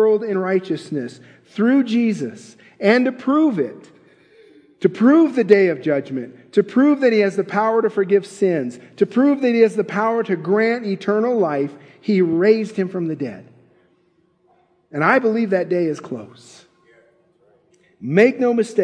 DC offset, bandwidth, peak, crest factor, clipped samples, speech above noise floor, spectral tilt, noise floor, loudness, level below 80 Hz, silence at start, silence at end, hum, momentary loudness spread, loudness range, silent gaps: under 0.1%; 10 kHz; 0 dBFS; 18 dB; under 0.1%; 43 dB; -7 dB/octave; -61 dBFS; -18 LUFS; -74 dBFS; 0 s; 0 s; none; 13 LU; 5 LU; none